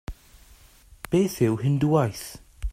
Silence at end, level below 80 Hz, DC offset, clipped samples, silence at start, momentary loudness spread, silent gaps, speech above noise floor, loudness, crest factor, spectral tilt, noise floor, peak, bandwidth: 0 s; -42 dBFS; under 0.1%; under 0.1%; 0.1 s; 19 LU; none; 30 dB; -24 LUFS; 18 dB; -7 dB/octave; -53 dBFS; -8 dBFS; 16 kHz